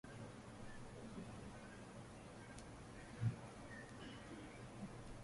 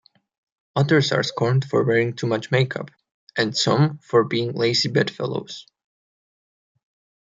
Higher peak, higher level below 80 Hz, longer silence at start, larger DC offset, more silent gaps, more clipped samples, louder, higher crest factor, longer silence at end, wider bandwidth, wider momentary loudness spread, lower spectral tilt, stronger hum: second, -30 dBFS vs -4 dBFS; about the same, -66 dBFS vs -64 dBFS; second, 0.05 s vs 0.75 s; neither; second, none vs 3.14-3.27 s; neither; second, -53 LUFS vs -21 LUFS; about the same, 22 dB vs 18 dB; second, 0 s vs 1.8 s; first, 11.5 kHz vs 9 kHz; about the same, 11 LU vs 12 LU; about the same, -6 dB/octave vs -5.5 dB/octave; neither